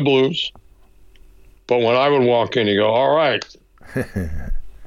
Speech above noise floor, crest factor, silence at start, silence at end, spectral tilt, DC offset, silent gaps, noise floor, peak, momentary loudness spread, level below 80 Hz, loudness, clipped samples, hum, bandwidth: 30 dB; 14 dB; 0 s; 0 s; -6 dB/octave; under 0.1%; none; -47 dBFS; -6 dBFS; 14 LU; -34 dBFS; -18 LUFS; under 0.1%; none; 13 kHz